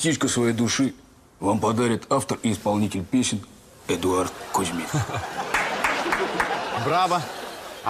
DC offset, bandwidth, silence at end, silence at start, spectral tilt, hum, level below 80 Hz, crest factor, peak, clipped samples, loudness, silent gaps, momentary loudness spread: under 0.1%; 15.5 kHz; 0 s; 0 s; -4 dB/octave; none; -54 dBFS; 14 dB; -10 dBFS; under 0.1%; -24 LUFS; none; 7 LU